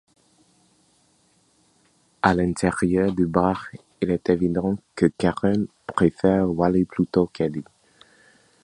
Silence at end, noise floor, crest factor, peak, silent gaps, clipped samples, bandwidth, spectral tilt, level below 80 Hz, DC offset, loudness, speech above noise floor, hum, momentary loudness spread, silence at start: 1 s; -62 dBFS; 22 dB; -2 dBFS; none; under 0.1%; 11 kHz; -7.5 dB/octave; -48 dBFS; under 0.1%; -22 LUFS; 41 dB; none; 7 LU; 2.25 s